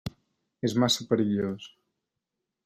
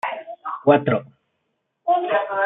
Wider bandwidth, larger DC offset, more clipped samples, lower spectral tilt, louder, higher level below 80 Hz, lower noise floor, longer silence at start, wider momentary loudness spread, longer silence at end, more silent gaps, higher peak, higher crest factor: first, 15.5 kHz vs 4 kHz; neither; neither; second, -5 dB/octave vs -8.5 dB/octave; second, -27 LUFS vs -21 LUFS; first, -60 dBFS vs -68 dBFS; first, -85 dBFS vs -74 dBFS; about the same, 0.05 s vs 0.05 s; first, 17 LU vs 14 LU; first, 0.95 s vs 0 s; neither; second, -10 dBFS vs -2 dBFS; about the same, 20 dB vs 20 dB